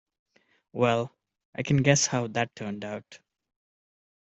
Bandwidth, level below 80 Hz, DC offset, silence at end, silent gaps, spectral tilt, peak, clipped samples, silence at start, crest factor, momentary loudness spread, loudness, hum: 8.2 kHz; -62 dBFS; under 0.1%; 1.25 s; 1.45-1.53 s; -4.5 dB/octave; -6 dBFS; under 0.1%; 0.75 s; 22 dB; 17 LU; -27 LUFS; none